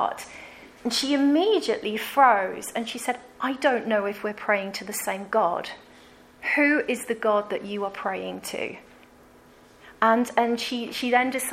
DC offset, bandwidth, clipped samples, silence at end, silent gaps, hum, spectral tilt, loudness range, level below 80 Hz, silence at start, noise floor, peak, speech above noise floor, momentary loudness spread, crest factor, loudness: under 0.1%; 16 kHz; under 0.1%; 0 s; none; none; -3 dB/octave; 4 LU; -66 dBFS; 0 s; -53 dBFS; -6 dBFS; 28 dB; 12 LU; 20 dB; -25 LUFS